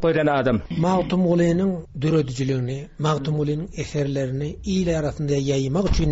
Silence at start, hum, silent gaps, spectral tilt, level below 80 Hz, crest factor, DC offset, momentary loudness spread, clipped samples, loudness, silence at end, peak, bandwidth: 0 s; none; none; -7 dB/octave; -36 dBFS; 14 dB; under 0.1%; 7 LU; under 0.1%; -23 LUFS; 0 s; -8 dBFS; 8 kHz